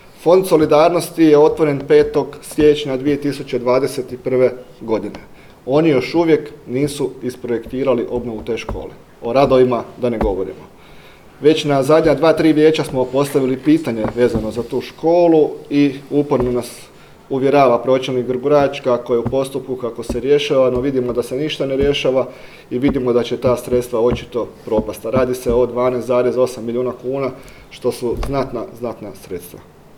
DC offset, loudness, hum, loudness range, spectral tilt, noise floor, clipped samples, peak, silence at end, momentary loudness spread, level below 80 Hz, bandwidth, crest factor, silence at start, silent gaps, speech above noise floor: under 0.1%; -17 LUFS; none; 4 LU; -6.5 dB/octave; -41 dBFS; under 0.1%; 0 dBFS; 0.35 s; 12 LU; -40 dBFS; 17 kHz; 16 dB; 0.2 s; none; 25 dB